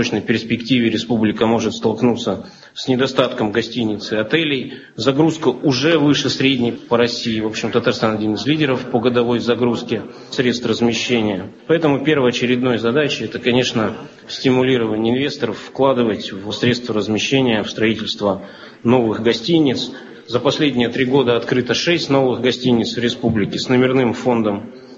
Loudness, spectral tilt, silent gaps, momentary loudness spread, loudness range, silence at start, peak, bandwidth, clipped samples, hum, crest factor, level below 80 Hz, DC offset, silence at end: -18 LUFS; -5.5 dB/octave; none; 7 LU; 2 LU; 0 s; 0 dBFS; 7.8 kHz; under 0.1%; none; 16 dB; -50 dBFS; under 0.1%; 0 s